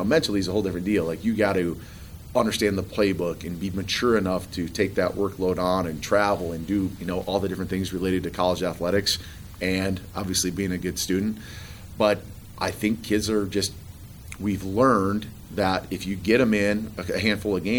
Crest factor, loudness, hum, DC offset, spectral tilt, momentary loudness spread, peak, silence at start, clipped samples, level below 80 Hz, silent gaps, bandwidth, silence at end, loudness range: 18 dB; -25 LUFS; none; 0.1%; -5 dB/octave; 9 LU; -6 dBFS; 0 s; under 0.1%; -46 dBFS; none; over 20 kHz; 0 s; 2 LU